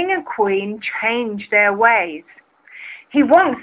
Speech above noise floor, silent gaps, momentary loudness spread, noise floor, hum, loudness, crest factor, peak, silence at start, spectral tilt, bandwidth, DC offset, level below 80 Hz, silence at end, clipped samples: 23 dB; none; 21 LU; -39 dBFS; none; -16 LUFS; 16 dB; 0 dBFS; 0 s; -8 dB/octave; 4 kHz; under 0.1%; -60 dBFS; 0 s; under 0.1%